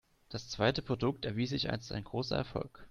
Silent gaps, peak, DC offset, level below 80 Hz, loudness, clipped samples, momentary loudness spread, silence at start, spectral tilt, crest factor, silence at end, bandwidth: none; -12 dBFS; under 0.1%; -56 dBFS; -35 LUFS; under 0.1%; 10 LU; 0.3 s; -5.5 dB/octave; 22 dB; 0 s; 10.5 kHz